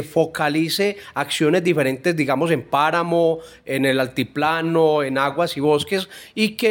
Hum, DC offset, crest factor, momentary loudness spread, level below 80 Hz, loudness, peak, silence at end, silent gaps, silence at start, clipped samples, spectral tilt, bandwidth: none; under 0.1%; 16 dB; 6 LU; -60 dBFS; -20 LUFS; -4 dBFS; 0 s; none; 0 s; under 0.1%; -5 dB/octave; 17 kHz